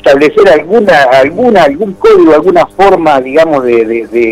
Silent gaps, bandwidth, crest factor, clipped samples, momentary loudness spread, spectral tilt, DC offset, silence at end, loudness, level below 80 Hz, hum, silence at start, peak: none; 13.5 kHz; 6 dB; 3%; 5 LU; -6 dB/octave; under 0.1%; 0 s; -6 LUFS; -38 dBFS; none; 0.05 s; 0 dBFS